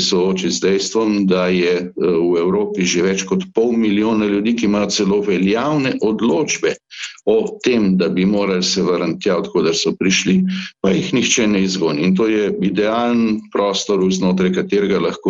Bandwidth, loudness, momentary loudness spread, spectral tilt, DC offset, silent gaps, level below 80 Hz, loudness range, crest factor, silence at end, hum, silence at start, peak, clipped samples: 8 kHz; -16 LUFS; 3 LU; -4.5 dB/octave; under 0.1%; none; -52 dBFS; 1 LU; 12 dB; 0 s; none; 0 s; -4 dBFS; under 0.1%